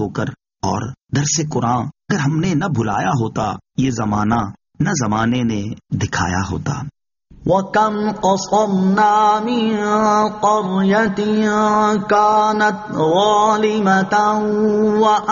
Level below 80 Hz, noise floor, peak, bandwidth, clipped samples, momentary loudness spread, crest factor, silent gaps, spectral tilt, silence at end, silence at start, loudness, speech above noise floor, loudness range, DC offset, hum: -46 dBFS; -45 dBFS; -2 dBFS; 7.4 kHz; under 0.1%; 9 LU; 14 dB; none; -5 dB/octave; 0 s; 0 s; -17 LUFS; 29 dB; 5 LU; under 0.1%; none